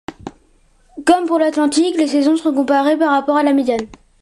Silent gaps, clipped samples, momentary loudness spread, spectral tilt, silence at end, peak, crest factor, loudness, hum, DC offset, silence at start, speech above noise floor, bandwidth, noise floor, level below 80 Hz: none; under 0.1%; 15 LU; -3.5 dB/octave; 0.35 s; -2 dBFS; 14 dB; -15 LUFS; none; under 0.1%; 0.1 s; 39 dB; 12 kHz; -53 dBFS; -52 dBFS